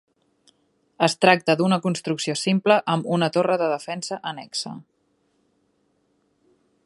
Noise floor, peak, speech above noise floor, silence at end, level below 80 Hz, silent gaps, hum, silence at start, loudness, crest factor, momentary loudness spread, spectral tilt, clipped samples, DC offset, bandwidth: -68 dBFS; 0 dBFS; 46 dB; 2.05 s; -72 dBFS; none; none; 1 s; -22 LUFS; 24 dB; 12 LU; -5 dB/octave; under 0.1%; under 0.1%; 11.5 kHz